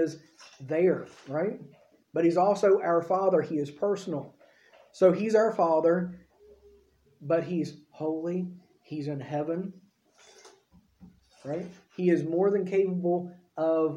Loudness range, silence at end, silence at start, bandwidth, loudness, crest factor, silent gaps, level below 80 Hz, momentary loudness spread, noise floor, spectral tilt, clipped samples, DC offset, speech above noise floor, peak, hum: 9 LU; 0 s; 0 s; 10.5 kHz; -28 LUFS; 18 dB; none; -74 dBFS; 15 LU; -62 dBFS; -7.5 dB/octave; under 0.1%; under 0.1%; 35 dB; -10 dBFS; none